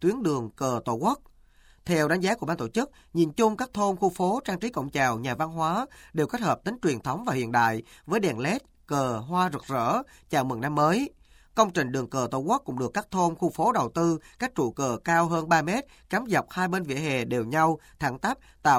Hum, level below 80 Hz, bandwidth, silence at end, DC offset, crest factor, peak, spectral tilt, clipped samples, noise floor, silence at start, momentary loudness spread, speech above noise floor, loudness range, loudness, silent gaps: none; -58 dBFS; 16.5 kHz; 0 s; under 0.1%; 20 dB; -6 dBFS; -5.5 dB/octave; under 0.1%; -57 dBFS; 0 s; 7 LU; 30 dB; 2 LU; -27 LUFS; none